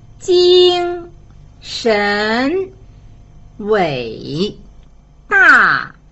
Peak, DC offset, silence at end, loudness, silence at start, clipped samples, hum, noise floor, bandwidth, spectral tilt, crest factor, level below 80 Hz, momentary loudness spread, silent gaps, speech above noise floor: 0 dBFS; under 0.1%; 0.25 s; -13 LUFS; 0.2 s; under 0.1%; none; -42 dBFS; 8.2 kHz; -4.5 dB/octave; 16 dB; -42 dBFS; 16 LU; none; 30 dB